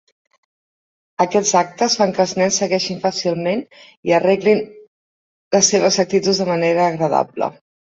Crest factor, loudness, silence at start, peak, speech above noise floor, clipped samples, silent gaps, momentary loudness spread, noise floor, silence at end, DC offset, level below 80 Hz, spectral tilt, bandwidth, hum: 16 dB; -17 LUFS; 1.2 s; -2 dBFS; over 73 dB; under 0.1%; 3.97-4.03 s, 4.87-5.51 s; 8 LU; under -90 dBFS; 0.3 s; under 0.1%; -60 dBFS; -3.5 dB/octave; 8.2 kHz; none